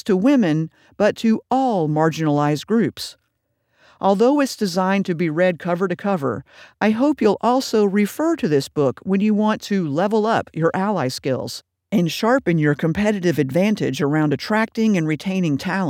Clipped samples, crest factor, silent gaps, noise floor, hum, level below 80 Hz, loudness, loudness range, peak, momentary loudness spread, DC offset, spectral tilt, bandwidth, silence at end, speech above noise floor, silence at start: under 0.1%; 16 dB; none; -71 dBFS; none; -58 dBFS; -19 LUFS; 2 LU; -4 dBFS; 5 LU; under 0.1%; -6.5 dB/octave; 16 kHz; 0 s; 52 dB; 0.05 s